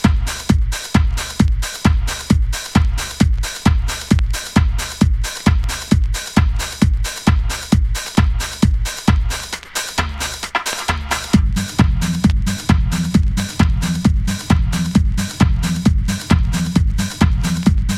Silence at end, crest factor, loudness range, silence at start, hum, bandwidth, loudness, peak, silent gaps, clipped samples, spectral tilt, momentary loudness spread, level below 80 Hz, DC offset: 0 s; 16 dB; 2 LU; 0 s; none; 16 kHz; -18 LUFS; 0 dBFS; none; under 0.1%; -5 dB/octave; 4 LU; -20 dBFS; under 0.1%